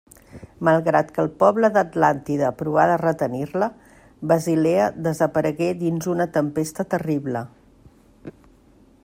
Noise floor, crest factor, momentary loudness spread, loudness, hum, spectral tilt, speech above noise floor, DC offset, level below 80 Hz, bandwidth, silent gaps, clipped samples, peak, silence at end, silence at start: -53 dBFS; 18 dB; 7 LU; -21 LUFS; none; -7 dB/octave; 33 dB; under 0.1%; -58 dBFS; 16 kHz; none; under 0.1%; -4 dBFS; 0.75 s; 0.35 s